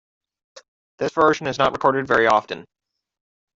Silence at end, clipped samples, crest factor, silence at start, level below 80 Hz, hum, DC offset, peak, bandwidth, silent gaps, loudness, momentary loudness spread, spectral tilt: 0.95 s; under 0.1%; 20 dB; 0.55 s; -58 dBFS; none; under 0.1%; -4 dBFS; 7.8 kHz; 0.68-0.98 s; -19 LUFS; 13 LU; -5 dB/octave